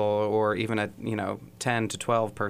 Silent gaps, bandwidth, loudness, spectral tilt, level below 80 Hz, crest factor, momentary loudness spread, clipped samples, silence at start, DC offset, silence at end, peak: none; 15.5 kHz; -28 LUFS; -5 dB/octave; -62 dBFS; 16 dB; 7 LU; under 0.1%; 0 s; under 0.1%; 0 s; -12 dBFS